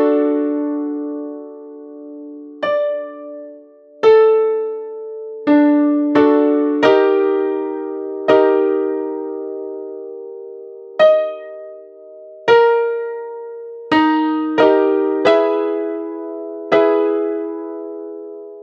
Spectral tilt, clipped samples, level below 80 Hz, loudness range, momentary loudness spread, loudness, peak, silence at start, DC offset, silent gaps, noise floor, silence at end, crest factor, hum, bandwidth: -6 dB/octave; under 0.1%; -68 dBFS; 6 LU; 20 LU; -16 LUFS; 0 dBFS; 0 s; under 0.1%; none; -42 dBFS; 0 s; 16 dB; none; 6.8 kHz